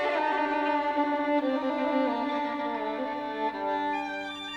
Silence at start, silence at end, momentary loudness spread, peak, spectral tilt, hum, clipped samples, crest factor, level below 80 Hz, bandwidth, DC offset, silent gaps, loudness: 0 s; 0 s; 5 LU; -14 dBFS; -4.5 dB/octave; none; under 0.1%; 14 dB; -66 dBFS; 9.2 kHz; under 0.1%; none; -29 LUFS